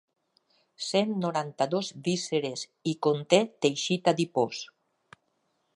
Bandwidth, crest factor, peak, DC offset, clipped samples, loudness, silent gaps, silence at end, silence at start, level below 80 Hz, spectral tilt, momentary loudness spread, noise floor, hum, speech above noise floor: 11.5 kHz; 24 dB; -6 dBFS; under 0.1%; under 0.1%; -28 LUFS; none; 1.1 s; 0.8 s; -78 dBFS; -4.5 dB/octave; 10 LU; -75 dBFS; none; 47 dB